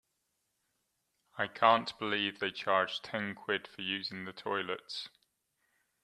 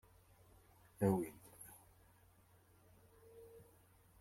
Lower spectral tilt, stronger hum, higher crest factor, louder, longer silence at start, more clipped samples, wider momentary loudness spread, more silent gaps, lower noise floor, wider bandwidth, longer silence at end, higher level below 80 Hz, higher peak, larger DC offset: second, -4.5 dB/octave vs -8 dB/octave; neither; about the same, 26 dB vs 24 dB; first, -33 LUFS vs -40 LUFS; first, 1.35 s vs 1 s; neither; second, 14 LU vs 29 LU; neither; first, -81 dBFS vs -69 dBFS; second, 13 kHz vs 16.5 kHz; first, 0.95 s vs 0.6 s; second, -80 dBFS vs -74 dBFS; first, -10 dBFS vs -22 dBFS; neither